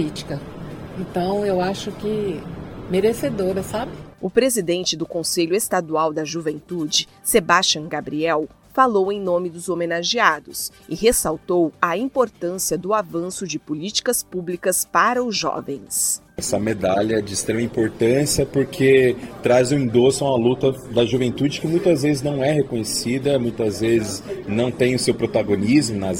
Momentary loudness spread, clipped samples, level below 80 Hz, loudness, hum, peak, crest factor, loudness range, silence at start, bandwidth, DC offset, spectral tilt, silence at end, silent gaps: 10 LU; under 0.1%; -48 dBFS; -20 LUFS; none; 0 dBFS; 20 dB; 4 LU; 0 s; 17 kHz; under 0.1%; -4 dB/octave; 0 s; none